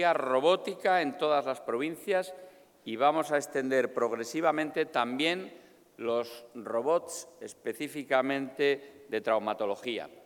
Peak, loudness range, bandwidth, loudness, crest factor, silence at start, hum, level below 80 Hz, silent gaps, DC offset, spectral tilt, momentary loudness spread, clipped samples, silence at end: -12 dBFS; 3 LU; 19 kHz; -30 LUFS; 20 dB; 0 s; none; -84 dBFS; none; under 0.1%; -4 dB/octave; 13 LU; under 0.1%; 0.05 s